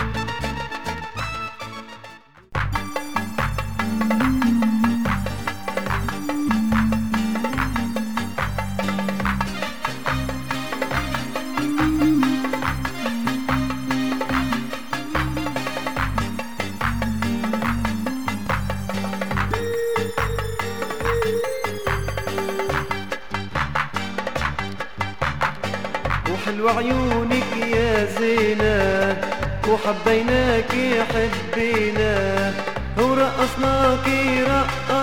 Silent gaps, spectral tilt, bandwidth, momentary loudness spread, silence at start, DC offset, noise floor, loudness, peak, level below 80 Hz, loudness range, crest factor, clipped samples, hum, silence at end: none; -5.5 dB/octave; 20 kHz; 8 LU; 0 s; 2%; -44 dBFS; -23 LUFS; -4 dBFS; -36 dBFS; 5 LU; 18 dB; under 0.1%; none; 0 s